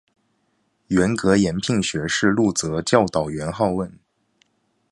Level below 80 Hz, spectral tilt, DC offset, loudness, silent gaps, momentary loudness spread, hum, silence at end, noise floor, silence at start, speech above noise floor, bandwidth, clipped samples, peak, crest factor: -48 dBFS; -5 dB/octave; under 0.1%; -20 LUFS; none; 6 LU; none; 0.95 s; -68 dBFS; 0.9 s; 48 dB; 11.5 kHz; under 0.1%; 0 dBFS; 22 dB